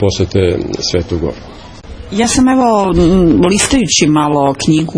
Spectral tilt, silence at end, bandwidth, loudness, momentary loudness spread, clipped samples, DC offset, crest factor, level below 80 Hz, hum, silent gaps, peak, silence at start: -4.5 dB/octave; 0 s; 10.5 kHz; -11 LUFS; 9 LU; under 0.1%; under 0.1%; 12 dB; -28 dBFS; none; none; 0 dBFS; 0 s